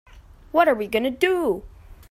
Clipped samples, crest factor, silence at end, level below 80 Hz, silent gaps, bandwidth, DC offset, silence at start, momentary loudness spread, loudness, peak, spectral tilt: under 0.1%; 18 dB; 0.15 s; -48 dBFS; none; 16 kHz; under 0.1%; 0.15 s; 6 LU; -22 LUFS; -4 dBFS; -5 dB/octave